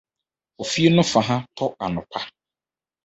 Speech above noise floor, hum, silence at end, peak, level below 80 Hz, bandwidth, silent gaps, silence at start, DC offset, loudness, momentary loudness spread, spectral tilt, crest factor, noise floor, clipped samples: over 69 dB; none; 0.75 s; -2 dBFS; -56 dBFS; 8.2 kHz; none; 0.6 s; under 0.1%; -21 LUFS; 15 LU; -5 dB/octave; 20 dB; under -90 dBFS; under 0.1%